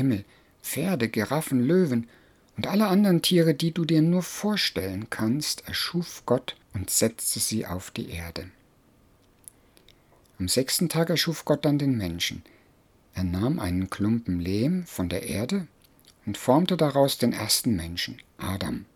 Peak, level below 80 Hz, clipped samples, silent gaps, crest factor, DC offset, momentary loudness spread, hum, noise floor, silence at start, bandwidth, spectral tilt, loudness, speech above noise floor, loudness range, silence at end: -6 dBFS; -54 dBFS; under 0.1%; none; 20 dB; under 0.1%; 13 LU; none; -60 dBFS; 0 s; 19 kHz; -4.5 dB/octave; -26 LUFS; 35 dB; 6 LU; 0.1 s